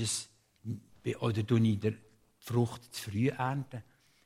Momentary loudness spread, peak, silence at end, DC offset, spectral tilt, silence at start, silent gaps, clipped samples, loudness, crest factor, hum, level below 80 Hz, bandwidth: 19 LU; -16 dBFS; 0.45 s; under 0.1%; -5.5 dB/octave; 0 s; none; under 0.1%; -33 LUFS; 18 dB; none; -68 dBFS; 16 kHz